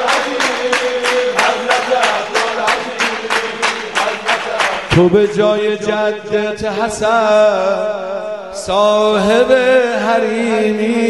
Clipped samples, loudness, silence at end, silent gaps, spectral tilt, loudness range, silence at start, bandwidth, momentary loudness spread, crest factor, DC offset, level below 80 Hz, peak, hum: under 0.1%; -14 LUFS; 0 s; none; -4 dB/octave; 2 LU; 0 s; 12 kHz; 7 LU; 14 dB; 0.3%; -46 dBFS; 0 dBFS; none